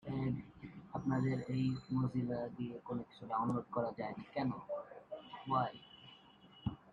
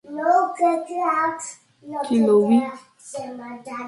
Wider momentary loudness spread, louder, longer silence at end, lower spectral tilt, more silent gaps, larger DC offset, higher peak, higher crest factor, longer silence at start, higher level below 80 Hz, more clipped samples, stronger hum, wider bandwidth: about the same, 16 LU vs 18 LU; second, -40 LUFS vs -20 LUFS; about the same, 0 s vs 0 s; first, -9 dB/octave vs -5.5 dB/octave; neither; neither; second, -22 dBFS vs -6 dBFS; about the same, 18 dB vs 16 dB; about the same, 0.05 s vs 0.05 s; about the same, -66 dBFS vs -70 dBFS; neither; neither; second, 7.6 kHz vs 11.5 kHz